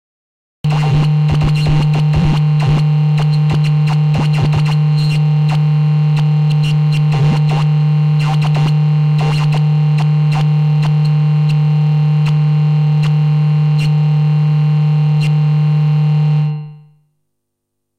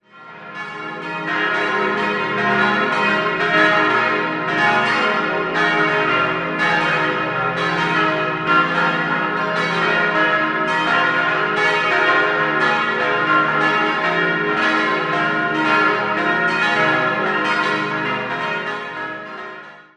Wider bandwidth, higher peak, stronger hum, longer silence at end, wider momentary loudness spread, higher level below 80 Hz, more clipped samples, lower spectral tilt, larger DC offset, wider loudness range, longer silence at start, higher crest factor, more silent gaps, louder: second, 6 kHz vs 10.5 kHz; second, -6 dBFS vs -2 dBFS; neither; first, 1.2 s vs 0.15 s; second, 1 LU vs 8 LU; first, -34 dBFS vs -58 dBFS; neither; first, -8 dB/octave vs -5 dB/octave; neither; about the same, 1 LU vs 2 LU; first, 0.65 s vs 0.15 s; second, 8 dB vs 16 dB; neither; first, -13 LUFS vs -17 LUFS